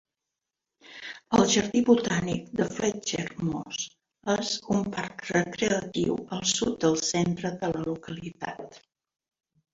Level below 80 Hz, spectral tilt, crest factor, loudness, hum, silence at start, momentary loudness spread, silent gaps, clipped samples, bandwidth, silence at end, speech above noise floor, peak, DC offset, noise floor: -58 dBFS; -4 dB/octave; 22 dB; -27 LUFS; none; 0.9 s; 15 LU; none; under 0.1%; 7.8 kHz; 0.95 s; 60 dB; -6 dBFS; under 0.1%; -87 dBFS